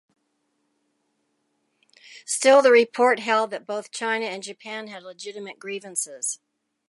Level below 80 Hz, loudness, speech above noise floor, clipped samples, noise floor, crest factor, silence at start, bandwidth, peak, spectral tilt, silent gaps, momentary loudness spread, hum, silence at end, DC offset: -86 dBFS; -21 LUFS; 51 dB; under 0.1%; -73 dBFS; 20 dB; 2.1 s; 11.5 kHz; -4 dBFS; -1.5 dB/octave; none; 20 LU; none; 0.55 s; under 0.1%